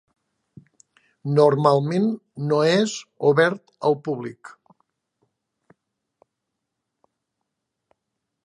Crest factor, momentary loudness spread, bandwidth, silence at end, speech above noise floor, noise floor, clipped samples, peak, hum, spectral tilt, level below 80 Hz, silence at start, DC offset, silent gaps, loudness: 22 dB; 12 LU; 11 kHz; 3.95 s; 61 dB; -81 dBFS; under 0.1%; -2 dBFS; none; -6 dB/octave; -74 dBFS; 1.25 s; under 0.1%; none; -21 LUFS